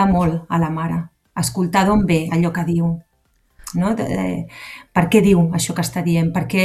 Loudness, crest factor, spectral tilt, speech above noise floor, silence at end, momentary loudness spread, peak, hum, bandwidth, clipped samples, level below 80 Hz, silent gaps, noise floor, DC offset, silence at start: -18 LUFS; 18 dB; -6 dB/octave; 44 dB; 0 s; 12 LU; 0 dBFS; none; 14.5 kHz; under 0.1%; -40 dBFS; none; -62 dBFS; under 0.1%; 0 s